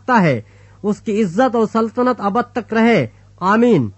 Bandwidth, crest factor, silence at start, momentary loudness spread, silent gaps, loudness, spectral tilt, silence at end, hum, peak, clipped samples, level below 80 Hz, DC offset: 8.4 kHz; 14 dB; 0.1 s; 9 LU; none; -17 LUFS; -7 dB/octave; 0.05 s; none; -2 dBFS; under 0.1%; -54 dBFS; under 0.1%